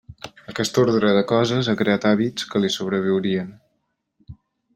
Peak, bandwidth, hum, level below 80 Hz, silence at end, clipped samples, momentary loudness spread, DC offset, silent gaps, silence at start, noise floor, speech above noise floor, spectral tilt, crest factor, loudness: -4 dBFS; 15.5 kHz; none; -58 dBFS; 0.45 s; under 0.1%; 13 LU; under 0.1%; none; 0.1 s; -73 dBFS; 53 dB; -5.5 dB/octave; 18 dB; -20 LUFS